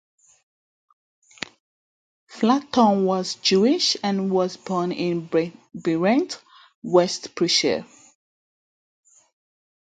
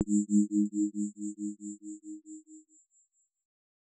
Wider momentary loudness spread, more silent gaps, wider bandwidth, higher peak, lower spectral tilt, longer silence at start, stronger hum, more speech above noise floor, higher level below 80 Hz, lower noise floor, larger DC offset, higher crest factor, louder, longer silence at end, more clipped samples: second, 14 LU vs 20 LU; first, 6.75-6.82 s vs none; about the same, 9.4 kHz vs 8.8 kHz; first, -4 dBFS vs -14 dBFS; second, -4.5 dB/octave vs -10 dB/octave; first, 2.3 s vs 0 s; neither; first, over 69 dB vs 41 dB; first, -68 dBFS vs -80 dBFS; first, under -90 dBFS vs -72 dBFS; neither; about the same, 20 dB vs 20 dB; first, -22 LUFS vs -31 LUFS; first, 1.95 s vs 1.4 s; neither